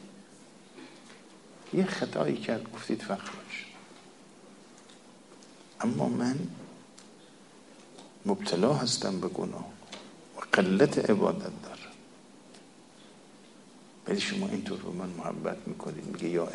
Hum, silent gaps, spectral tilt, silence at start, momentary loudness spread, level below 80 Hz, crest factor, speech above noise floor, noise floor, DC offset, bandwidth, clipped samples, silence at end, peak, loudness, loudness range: none; none; -5 dB/octave; 0 s; 26 LU; -72 dBFS; 26 dB; 24 dB; -54 dBFS; under 0.1%; 11.5 kHz; under 0.1%; 0 s; -6 dBFS; -31 LUFS; 9 LU